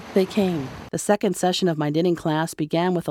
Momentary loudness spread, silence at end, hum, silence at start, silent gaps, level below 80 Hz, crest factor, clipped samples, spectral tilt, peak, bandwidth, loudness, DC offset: 5 LU; 0 s; none; 0 s; none; -56 dBFS; 16 dB; under 0.1%; -5.5 dB/octave; -6 dBFS; 16.5 kHz; -23 LUFS; under 0.1%